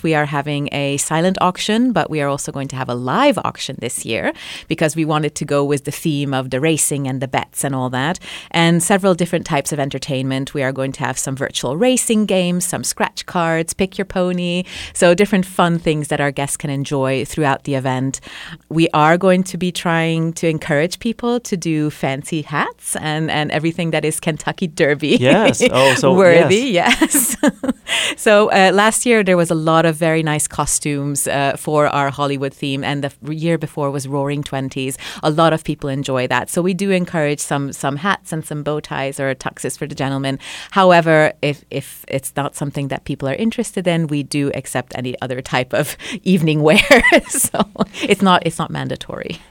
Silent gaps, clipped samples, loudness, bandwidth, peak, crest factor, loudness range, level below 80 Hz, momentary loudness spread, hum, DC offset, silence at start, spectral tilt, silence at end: none; under 0.1%; -17 LUFS; 18 kHz; 0 dBFS; 16 dB; 6 LU; -46 dBFS; 11 LU; none; under 0.1%; 0.05 s; -4.5 dB/octave; 0.1 s